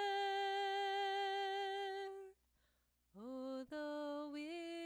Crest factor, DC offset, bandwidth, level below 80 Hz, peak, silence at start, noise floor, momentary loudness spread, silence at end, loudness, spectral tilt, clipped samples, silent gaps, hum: 10 dB; under 0.1%; over 20 kHz; -84 dBFS; -32 dBFS; 0 s; -80 dBFS; 12 LU; 0 s; -43 LUFS; -2.5 dB/octave; under 0.1%; none; 60 Hz at -85 dBFS